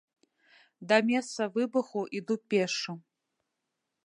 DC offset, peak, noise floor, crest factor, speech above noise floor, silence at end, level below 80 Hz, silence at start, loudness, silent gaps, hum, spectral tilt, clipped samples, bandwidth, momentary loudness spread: under 0.1%; -8 dBFS; -84 dBFS; 24 dB; 55 dB; 1.05 s; -86 dBFS; 0.8 s; -30 LUFS; none; none; -4.5 dB/octave; under 0.1%; 11 kHz; 12 LU